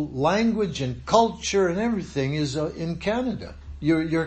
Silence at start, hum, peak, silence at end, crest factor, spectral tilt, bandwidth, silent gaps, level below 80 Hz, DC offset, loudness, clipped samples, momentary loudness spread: 0 s; none; -4 dBFS; 0 s; 20 dB; -5.5 dB/octave; 8.8 kHz; none; -44 dBFS; under 0.1%; -24 LUFS; under 0.1%; 8 LU